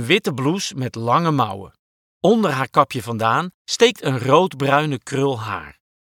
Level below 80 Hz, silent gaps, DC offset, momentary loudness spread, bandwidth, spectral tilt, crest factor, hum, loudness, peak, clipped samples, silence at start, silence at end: -60 dBFS; 1.79-2.21 s, 3.54-3.65 s; under 0.1%; 9 LU; 18 kHz; -5 dB/octave; 20 dB; none; -19 LUFS; 0 dBFS; under 0.1%; 0 s; 0.4 s